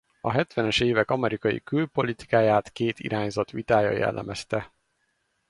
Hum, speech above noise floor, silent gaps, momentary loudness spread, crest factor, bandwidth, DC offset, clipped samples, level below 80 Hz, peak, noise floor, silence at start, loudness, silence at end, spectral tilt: none; 48 dB; none; 8 LU; 18 dB; 11.5 kHz; under 0.1%; under 0.1%; -54 dBFS; -6 dBFS; -73 dBFS; 0.25 s; -25 LUFS; 0.85 s; -6 dB/octave